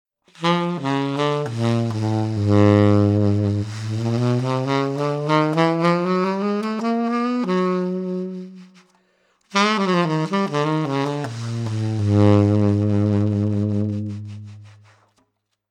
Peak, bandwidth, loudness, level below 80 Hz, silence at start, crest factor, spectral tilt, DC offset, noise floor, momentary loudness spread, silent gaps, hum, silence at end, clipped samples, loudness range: -2 dBFS; 9.8 kHz; -20 LUFS; -60 dBFS; 0.4 s; 18 dB; -7.5 dB/octave; under 0.1%; -69 dBFS; 11 LU; none; none; 1 s; under 0.1%; 4 LU